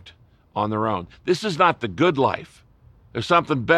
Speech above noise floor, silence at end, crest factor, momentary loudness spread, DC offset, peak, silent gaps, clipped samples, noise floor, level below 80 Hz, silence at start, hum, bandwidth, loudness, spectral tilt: 30 dB; 0 s; 18 dB; 12 LU; under 0.1%; -4 dBFS; none; under 0.1%; -51 dBFS; -56 dBFS; 0.05 s; none; 12 kHz; -22 LUFS; -6 dB/octave